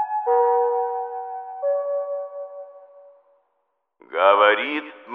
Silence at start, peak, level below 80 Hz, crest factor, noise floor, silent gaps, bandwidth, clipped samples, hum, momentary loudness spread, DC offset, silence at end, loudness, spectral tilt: 0 s; -2 dBFS; under -90 dBFS; 20 dB; -73 dBFS; none; 4 kHz; under 0.1%; none; 18 LU; under 0.1%; 0 s; -21 LUFS; -4.5 dB/octave